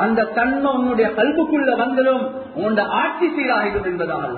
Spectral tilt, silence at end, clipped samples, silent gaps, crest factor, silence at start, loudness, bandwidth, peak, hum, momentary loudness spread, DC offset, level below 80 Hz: -10.5 dB/octave; 0 s; under 0.1%; none; 14 dB; 0 s; -19 LUFS; 4.5 kHz; -6 dBFS; none; 5 LU; under 0.1%; -48 dBFS